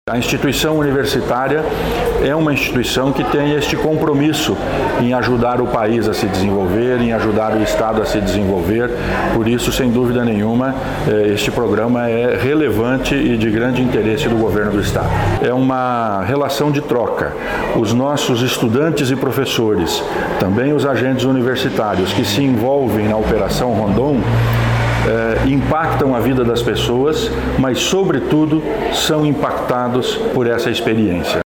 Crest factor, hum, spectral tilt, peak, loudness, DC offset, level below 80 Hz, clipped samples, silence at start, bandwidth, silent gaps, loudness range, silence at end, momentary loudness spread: 14 dB; none; -5.5 dB/octave; -2 dBFS; -16 LUFS; under 0.1%; -32 dBFS; under 0.1%; 0.05 s; 19 kHz; none; 1 LU; 0.05 s; 3 LU